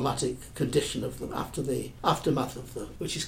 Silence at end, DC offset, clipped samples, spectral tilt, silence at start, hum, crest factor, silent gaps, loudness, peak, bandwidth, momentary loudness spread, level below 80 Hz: 0 s; under 0.1%; under 0.1%; -5 dB/octave; 0 s; none; 22 dB; none; -31 LUFS; -8 dBFS; 16.5 kHz; 8 LU; -48 dBFS